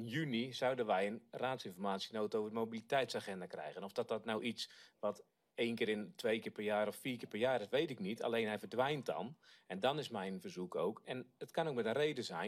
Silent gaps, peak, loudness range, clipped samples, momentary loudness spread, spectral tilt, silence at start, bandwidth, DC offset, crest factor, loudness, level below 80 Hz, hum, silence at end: none; -22 dBFS; 3 LU; under 0.1%; 9 LU; -5 dB/octave; 0 s; 15.5 kHz; under 0.1%; 18 dB; -40 LUFS; -84 dBFS; none; 0 s